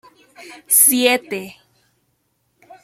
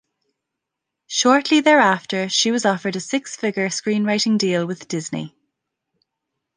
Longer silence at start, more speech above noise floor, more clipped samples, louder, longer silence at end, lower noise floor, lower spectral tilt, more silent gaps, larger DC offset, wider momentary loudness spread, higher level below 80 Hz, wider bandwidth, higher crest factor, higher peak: second, 0.4 s vs 1.1 s; second, 50 dB vs 63 dB; neither; first, -13 LUFS vs -19 LUFS; about the same, 1.35 s vs 1.3 s; second, -67 dBFS vs -82 dBFS; second, -0.5 dB/octave vs -3.5 dB/octave; neither; neither; first, 18 LU vs 12 LU; about the same, -70 dBFS vs -70 dBFS; first, 16.5 kHz vs 10 kHz; about the same, 20 dB vs 20 dB; about the same, 0 dBFS vs -2 dBFS